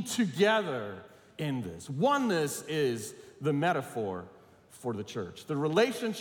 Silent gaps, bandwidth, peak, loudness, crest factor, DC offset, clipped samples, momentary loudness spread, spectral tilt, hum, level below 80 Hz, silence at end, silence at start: none; 18 kHz; -12 dBFS; -31 LUFS; 20 dB; under 0.1%; under 0.1%; 13 LU; -5 dB/octave; none; -74 dBFS; 0 s; 0 s